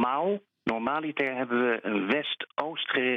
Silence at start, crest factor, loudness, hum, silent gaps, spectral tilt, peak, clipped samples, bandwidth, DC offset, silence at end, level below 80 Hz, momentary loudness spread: 0 s; 18 dB; -29 LUFS; none; none; -6.5 dB/octave; -10 dBFS; under 0.1%; 6.8 kHz; under 0.1%; 0 s; -68 dBFS; 5 LU